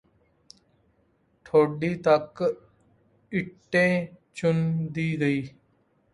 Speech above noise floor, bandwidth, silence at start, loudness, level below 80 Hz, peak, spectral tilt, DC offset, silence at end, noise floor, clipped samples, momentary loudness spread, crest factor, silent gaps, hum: 42 dB; 11.5 kHz; 1.55 s; -25 LUFS; -64 dBFS; -8 dBFS; -7.5 dB/octave; under 0.1%; 0.65 s; -67 dBFS; under 0.1%; 9 LU; 20 dB; none; none